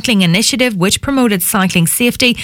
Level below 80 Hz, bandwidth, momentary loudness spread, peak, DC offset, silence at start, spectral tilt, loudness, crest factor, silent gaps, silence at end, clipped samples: -40 dBFS; 18 kHz; 2 LU; 0 dBFS; under 0.1%; 0 s; -3.5 dB/octave; -12 LUFS; 12 dB; none; 0 s; under 0.1%